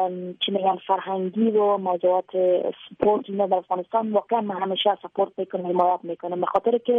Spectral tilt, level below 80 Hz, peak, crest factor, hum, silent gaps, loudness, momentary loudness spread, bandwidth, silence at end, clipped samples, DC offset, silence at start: -8.5 dB/octave; -68 dBFS; -6 dBFS; 16 dB; none; none; -24 LUFS; 6 LU; 3.9 kHz; 0 s; under 0.1%; under 0.1%; 0 s